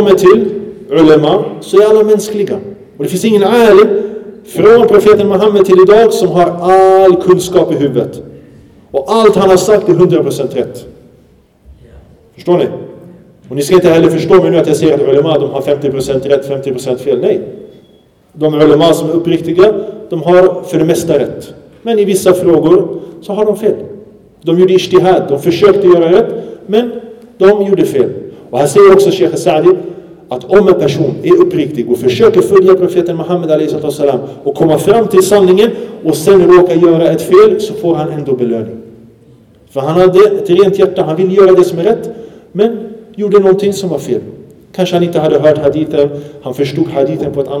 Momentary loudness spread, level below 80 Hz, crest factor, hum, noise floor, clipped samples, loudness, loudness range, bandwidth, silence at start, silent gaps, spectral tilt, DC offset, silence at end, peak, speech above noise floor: 13 LU; -44 dBFS; 10 dB; none; -45 dBFS; 1%; -9 LUFS; 5 LU; 15 kHz; 0 s; none; -6 dB/octave; under 0.1%; 0 s; 0 dBFS; 37 dB